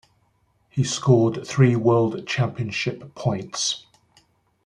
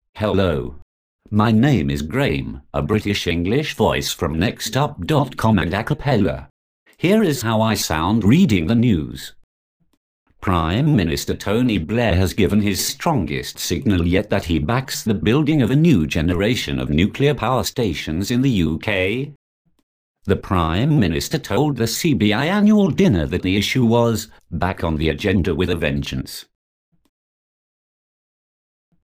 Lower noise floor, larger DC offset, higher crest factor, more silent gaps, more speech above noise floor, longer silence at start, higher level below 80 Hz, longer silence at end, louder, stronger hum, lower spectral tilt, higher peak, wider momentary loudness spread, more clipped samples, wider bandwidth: second, -65 dBFS vs under -90 dBFS; neither; about the same, 18 dB vs 16 dB; second, none vs 0.82-1.19 s, 6.50-6.86 s, 9.44-9.80 s, 9.97-10.26 s, 19.36-19.65 s, 19.83-20.15 s; second, 44 dB vs over 72 dB; first, 0.75 s vs 0.15 s; second, -60 dBFS vs -36 dBFS; second, 0.85 s vs 2.65 s; second, -22 LUFS vs -19 LUFS; neither; about the same, -5.5 dB/octave vs -6 dB/octave; about the same, -4 dBFS vs -4 dBFS; about the same, 10 LU vs 8 LU; neither; second, 10.5 kHz vs 15.5 kHz